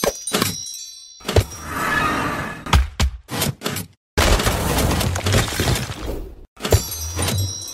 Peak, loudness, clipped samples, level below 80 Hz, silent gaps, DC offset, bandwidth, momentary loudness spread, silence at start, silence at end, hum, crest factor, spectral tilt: 0 dBFS; -21 LUFS; under 0.1%; -28 dBFS; 3.97-4.17 s, 6.48-6.56 s; under 0.1%; 16 kHz; 11 LU; 0 s; 0 s; none; 20 dB; -4 dB/octave